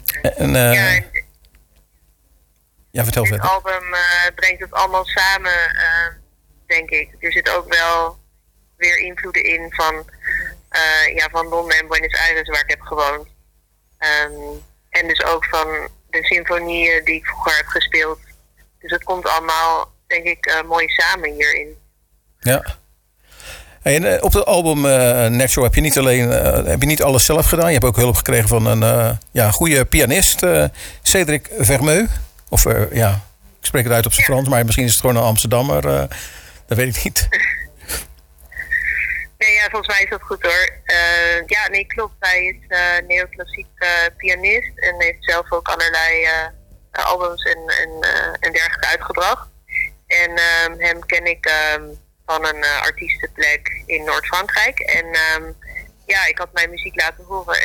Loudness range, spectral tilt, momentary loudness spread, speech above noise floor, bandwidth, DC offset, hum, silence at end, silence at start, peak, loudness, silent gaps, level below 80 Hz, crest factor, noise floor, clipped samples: 5 LU; -3.5 dB/octave; 9 LU; 42 dB; 19.5 kHz; under 0.1%; none; 0 s; 0 s; -2 dBFS; -16 LUFS; none; -32 dBFS; 16 dB; -58 dBFS; under 0.1%